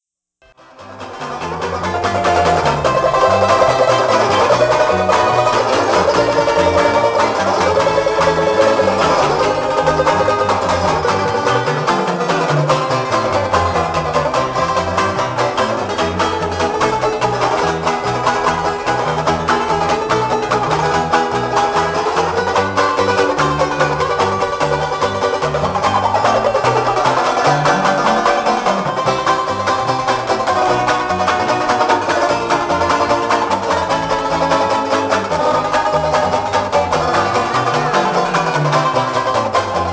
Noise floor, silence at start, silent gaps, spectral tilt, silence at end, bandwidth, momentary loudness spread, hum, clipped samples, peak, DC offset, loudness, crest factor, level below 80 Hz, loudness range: -54 dBFS; 0.8 s; none; -4.5 dB/octave; 0 s; 8 kHz; 4 LU; none; under 0.1%; 0 dBFS; under 0.1%; -15 LUFS; 14 dB; -38 dBFS; 3 LU